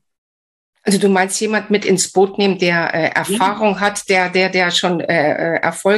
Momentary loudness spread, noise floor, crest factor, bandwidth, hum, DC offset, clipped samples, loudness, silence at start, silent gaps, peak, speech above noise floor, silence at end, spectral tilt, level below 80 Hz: 3 LU; under -90 dBFS; 14 dB; 13 kHz; none; under 0.1%; under 0.1%; -15 LUFS; 0.85 s; none; -2 dBFS; over 75 dB; 0 s; -4 dB/octave; -62 dBFS